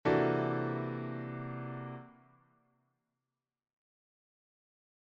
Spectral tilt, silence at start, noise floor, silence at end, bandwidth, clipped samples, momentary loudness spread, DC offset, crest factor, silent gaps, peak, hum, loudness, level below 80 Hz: -9 dB/octave; 0.05 s; under -90 dBFS; 2.9 s; 7 kHz; under 0.1%; 15 LU; under 0.1%; 20 dB; none; -18 dBFS; none; -36 LUFS; -70 dBFS